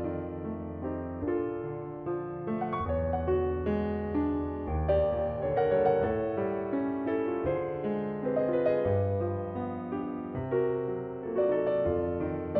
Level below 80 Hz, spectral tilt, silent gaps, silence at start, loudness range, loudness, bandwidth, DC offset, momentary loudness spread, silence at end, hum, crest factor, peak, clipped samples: -46 dBFS; -11.5 dB/octave; none; 0 s; 3 LU; -31 LUFS; 4.8 kHz; under 0.1%; 8 LU; 0 s; none; 16 dB; -14 dBFS; under 0.1%